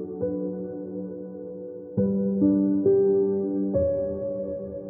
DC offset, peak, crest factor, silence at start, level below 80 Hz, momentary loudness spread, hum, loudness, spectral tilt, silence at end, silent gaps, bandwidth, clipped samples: under 0.1%; -10 dBFS; 14 dB; 0 s; -54 dBFS; 16 LU; none; -25 LUFS; -16 dB/octave; 0 s; none; 1.8 kHz; under 0.1%